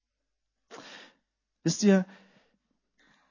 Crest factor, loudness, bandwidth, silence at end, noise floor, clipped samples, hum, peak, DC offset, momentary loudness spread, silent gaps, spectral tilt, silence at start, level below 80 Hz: 20 dB; -26 LUFS; 7.4 kHz; 1.25 s; -83 dBFS; under 0.1%; none; -12 dBFS; under 0.1%; 25 LU; none; -5.5 dB/octave; 0.7 s; -78 dBFS